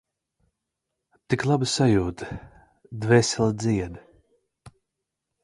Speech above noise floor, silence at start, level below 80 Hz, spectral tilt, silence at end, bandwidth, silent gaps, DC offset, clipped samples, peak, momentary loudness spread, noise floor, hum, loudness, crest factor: 60 dB; 1.3 s; -48 dBFS; -5.5 dB/octave; 0.75 s; 11.5 kHz; none; under 0.1%; under 0.1%; -4 dBFS; 17 LU; -83 dBFS; none; -23 LUFS; 22 dB